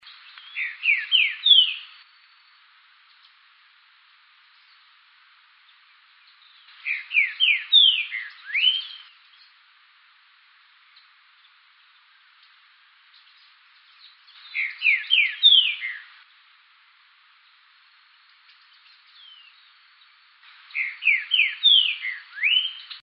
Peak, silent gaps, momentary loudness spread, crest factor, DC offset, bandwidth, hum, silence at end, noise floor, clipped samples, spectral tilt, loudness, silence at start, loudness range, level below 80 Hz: -4 dBFS; none; 18 LU; 22 dB; under 0.1%; 5.6 kHz; none; 0.05 s; -57 dBFS; under 0.1%; 15.5 dB/octave; -19 LUFS; 0.45 s; 13 LU; under -90 dBFS